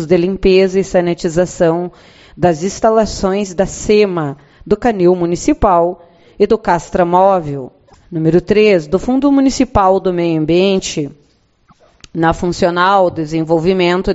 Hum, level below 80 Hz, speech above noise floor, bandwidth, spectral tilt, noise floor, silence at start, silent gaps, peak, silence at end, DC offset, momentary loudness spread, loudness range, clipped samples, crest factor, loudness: none; -34 dBFS; 41 dB; 8.2 kHz; -6 dB/octave; -54 dBFS; 0 s; none; 0 dBFS; 0 s; under 0.1%; 9 LU; 3 LU; under 0.1%; 14 dB; -13 LUFS